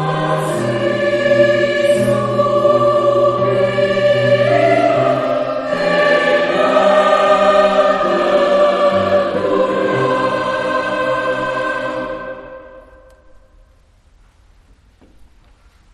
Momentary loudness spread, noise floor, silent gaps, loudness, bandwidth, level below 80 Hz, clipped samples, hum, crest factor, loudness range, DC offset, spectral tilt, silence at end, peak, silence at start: 7 LU; -50 dBFS; none; -14 LUFS; 12 kHz; -48 dBFS; under 0.1%; none; 14 dB; 9 LU; under 0.1%; -6 dB/octave; 3.15 s; 0 dBFS; 0 s